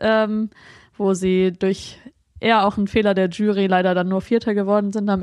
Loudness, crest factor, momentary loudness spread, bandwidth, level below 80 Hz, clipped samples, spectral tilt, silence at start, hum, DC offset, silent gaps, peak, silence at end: -20 LUFS; 16 dB; 7 LU; 11.5 kHz; -50 dBFS; under 0.1%; -6.5 dB/octave; 0 s; none; under 0.1%; none; -4 dBFS; 0 s